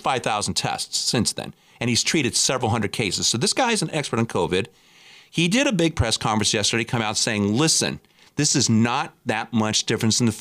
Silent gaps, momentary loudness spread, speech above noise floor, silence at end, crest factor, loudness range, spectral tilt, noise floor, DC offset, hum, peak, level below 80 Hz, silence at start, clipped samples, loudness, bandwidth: none; 7 LU; 28 dB; 0 s; 14 dB; 2 LU; -3.5 dB/octave; -50 dBFS; under 0.1%; none; -8 dBFS; -48 dBFS; 0.05 s; under 0.1%; -21 LUFS; 15.5 kHz